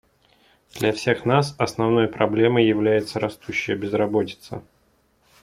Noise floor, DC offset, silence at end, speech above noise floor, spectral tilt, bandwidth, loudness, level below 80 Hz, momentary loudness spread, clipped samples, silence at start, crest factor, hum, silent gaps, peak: -63 dBFS; under 0.1%; 0.8 s; 42 dB; -6 dB/octave; 15.5 kHz; -21 LUFS; -58 dBFS; 12 LU; under 0.1%; 0.75 s; 20 dB; none; none; -4 dBFS